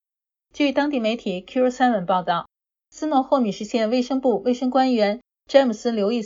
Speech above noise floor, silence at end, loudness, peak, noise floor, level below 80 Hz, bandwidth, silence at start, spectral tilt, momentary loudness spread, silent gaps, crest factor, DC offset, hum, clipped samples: 69 dB; 0 s; -21 LUFS; -2 dBFS; -90 dBFS; -62 dBFS; 7.6 kHz; 0.55 s; -5.5 dB/octave; 7 LU; none; 20 dB; under 0.1%; none; under 0.1%